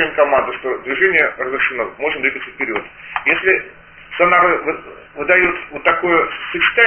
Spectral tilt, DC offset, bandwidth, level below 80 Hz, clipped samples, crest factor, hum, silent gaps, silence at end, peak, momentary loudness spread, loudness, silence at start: -7 dB/octave; under 0.1%; 4 kHz; -50 dBFS; under 0.1%; 16 dB; none; none; 0 s; 0 dBFS; 12 LU; -16 LUFS; 0 s